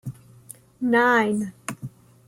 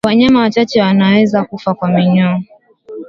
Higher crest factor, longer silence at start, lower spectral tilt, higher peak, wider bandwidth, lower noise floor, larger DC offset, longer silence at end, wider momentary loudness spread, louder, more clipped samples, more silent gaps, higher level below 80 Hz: about the same, 16 dB vs 12 dB; about the same, 0.05 s vs 0.05 s; second, -5.5 dB/octave vs -7.5 dB/octave; second, -8 dBFS vs 0 dBFS; first, 15.5 kHz vs 7.4 kHz; first, -48 dBFS vs -32 dBFS; neither; first, 0.4 s vs 0 s; first, 21 LU vs 8 LU; second, -21 LUFS vs -12 LUFS; neither; neither; second, -64 dBFS vs -48 dBFS